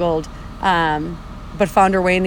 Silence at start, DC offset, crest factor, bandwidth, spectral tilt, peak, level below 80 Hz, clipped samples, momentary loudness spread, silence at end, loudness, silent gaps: 0 s; under 0.1%; 16 dB; 20 kHz; -5.5 dB/octave; -2 dBFS; -36 dBFS; under 0.1%; 19 LU; 0 s; -18 LUFS; none